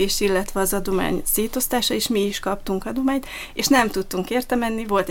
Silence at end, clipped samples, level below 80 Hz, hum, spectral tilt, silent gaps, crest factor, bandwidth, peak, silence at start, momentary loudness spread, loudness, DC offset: 0 s; under 0.1%; -38 dBFS; none; -3.5 dB/octave; none; 18 dB; 17 kHz; -4 dBFS; 0 s; 8 LU; -22 LUFS; under 0.1%